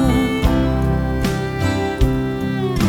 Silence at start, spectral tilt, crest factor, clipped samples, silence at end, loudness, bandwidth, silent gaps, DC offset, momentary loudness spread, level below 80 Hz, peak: 0 s; -6.5 dB/octave; 16 dB; under 0.1%; 0 s; -19 LUFS; 19 kHz; none; under 0.1%; 4 LU; -24 dBFS; -2 dBFS